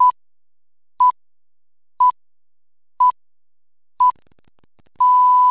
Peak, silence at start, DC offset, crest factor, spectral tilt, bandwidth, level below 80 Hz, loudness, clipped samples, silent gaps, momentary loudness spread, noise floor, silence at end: -8 dBFS; 0 s; under 0.1%; 12 dB; -5.5 dB/octave; 4 kHz; -70 dBFS; -16 LUFS; under 0.1%; none; 6 LU; under -90 dBFS; 0 s